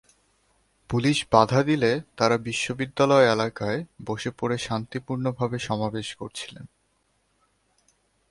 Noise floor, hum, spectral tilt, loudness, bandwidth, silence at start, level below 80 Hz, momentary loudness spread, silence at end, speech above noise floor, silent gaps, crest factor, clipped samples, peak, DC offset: -69 dBFS; none; -5.5 dB/octave; -24 LUFS; 11.5 kHz; 0.9 s; -56 dBFS; 14 LU; 1.65 s; 45 dB; none; 24 dB; under 0.1%; -2 dBFS; under 0.1%